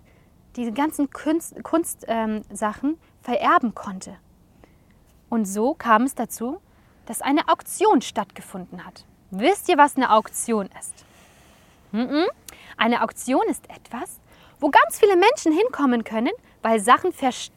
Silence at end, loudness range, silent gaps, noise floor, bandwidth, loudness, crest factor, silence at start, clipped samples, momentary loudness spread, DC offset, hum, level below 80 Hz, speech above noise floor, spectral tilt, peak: 0.1 s; 5 LU; none; -55 dBFS; 17 kHz; -21 LUFS; 22 dB; 0.55 s; under 0.1%; 19 LU; under 0.1%; none; -58 dBFS; 33 dB; -3.5 dB/octave; -2 dBFS